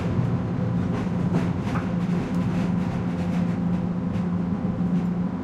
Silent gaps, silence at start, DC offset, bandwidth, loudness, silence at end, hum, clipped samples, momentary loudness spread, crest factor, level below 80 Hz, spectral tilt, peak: none; 0 s; under 0.1%; 7.6 kHz; -25 LUFS; 0 s; none; under 0.1%; 2 LU; 12 dB; -44 dBFS; -9 dB/octave; -12 dBFS